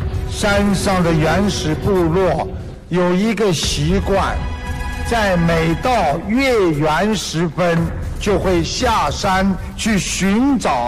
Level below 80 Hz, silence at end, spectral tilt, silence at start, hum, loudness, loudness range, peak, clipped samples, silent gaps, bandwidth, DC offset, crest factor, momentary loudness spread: -28 dBFS; 0 s; -5 dB/octave; 0 s; none; -17 LUFS; 1 LU; -6 dBFS; under 0.1%; none; 15 kHz; under 0.1%; 10 dB; 7 LU